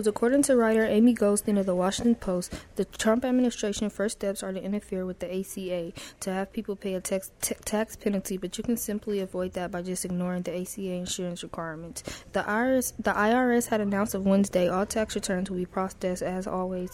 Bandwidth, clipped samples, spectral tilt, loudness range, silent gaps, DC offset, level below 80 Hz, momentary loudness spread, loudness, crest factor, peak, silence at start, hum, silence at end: 16 kHz; under 0.1%; -5 dB/octave; 7 LU; none; under 0.1%; -52 dBFS; 11 LU; -28 LUFS; 16 dB; -12 dBFS; 0 s; none; 0 s